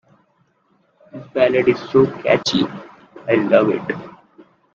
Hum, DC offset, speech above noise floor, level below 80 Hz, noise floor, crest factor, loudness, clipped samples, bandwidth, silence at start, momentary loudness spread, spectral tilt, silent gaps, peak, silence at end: none; under 0.1%; 45 dB; -56 dBFS; -62 dBFS; 18 dB; -17 LUFS; under 0.1%; 7.6 kHz; 1.15 s; 17 LU; -5.5 dB/octave; none; 0 dBFS; 0.65 s